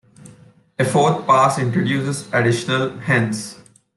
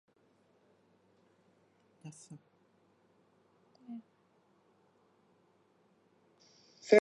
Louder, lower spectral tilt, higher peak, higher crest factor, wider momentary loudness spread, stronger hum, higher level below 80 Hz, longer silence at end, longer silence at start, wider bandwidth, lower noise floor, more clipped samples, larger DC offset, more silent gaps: first, -18 LUFS vs -35 LUFS; about the same, -5.5 dB/octave vs -5 dB/octave; first, -2 dBFS vs -10 dBFS; second, 16 dB vs 28 dB; second, 9 LU vs 14 LU; neither; first, -60 dBFS vs under -90 dBFS; first, 0.4 s vs 0 s; second, 0.25 s vs 3.9 s; first, 12.5 kHz vs 10.5 kHz; second, -48 dBFS vs -71 dBFS; neither; neither; neither